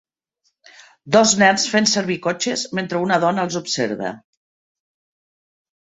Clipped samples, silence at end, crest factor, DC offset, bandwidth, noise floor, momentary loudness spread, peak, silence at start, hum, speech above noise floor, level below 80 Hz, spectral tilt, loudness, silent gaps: under 0.1%; 1.65 s; 20 dB; under 0.1%; 8.4 kHz; -70 dBFS; 9 LU; -2 dBFS; 1.05 s; none; 51 dB; -62 dBFS; -3 dB/octave; -18 LUFS; none